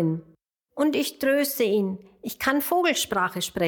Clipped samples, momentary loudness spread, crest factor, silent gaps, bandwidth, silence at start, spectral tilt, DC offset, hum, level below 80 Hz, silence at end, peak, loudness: under 0.1%; 12 LU; 18 dB; none; 19 kHz; 0 s; -4 dB/octave; under 0.1%; none; -60 dBFS; 0 s; -8 dBFS; -24 LUFS